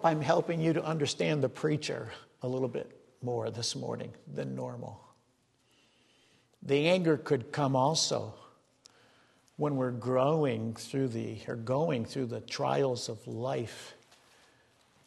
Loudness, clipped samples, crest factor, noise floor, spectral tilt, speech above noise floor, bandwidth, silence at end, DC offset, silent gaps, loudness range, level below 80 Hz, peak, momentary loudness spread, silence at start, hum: -32 LUFS; under 0.1%; 22 dB; -71 dBFS; -5 dB/octave; 40 dB; 12.5 kHz; 1.1 s; under 0.1%; none; 7 LU; -72 dBFS; -12 dBFS; 14 LU; 0 s; none